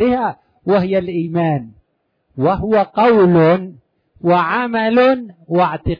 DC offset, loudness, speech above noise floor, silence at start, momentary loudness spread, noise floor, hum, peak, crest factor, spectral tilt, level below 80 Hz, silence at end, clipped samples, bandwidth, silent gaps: under 0.1%; -15 LUFS; 52 dB; 0 s; 11 LU; -67 dBFS; none; -2 dBFS; 14 dB; -9.5 dB/octave; -42 dBFS; 0.05 s; under 0.1%; 5.2 kHz; none